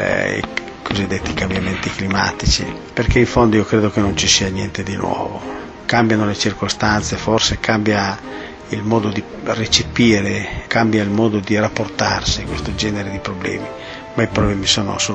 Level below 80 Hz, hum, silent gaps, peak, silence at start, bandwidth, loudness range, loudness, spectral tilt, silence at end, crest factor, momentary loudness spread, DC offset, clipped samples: -32 dBFS; none; none; 0 dBFS; 0 s; 8.6 kHz; 3 LU; -17 LUFS; -4 dB/octave; 0 s; 16 dB; 11 LU; under 0.1%; under 0.1%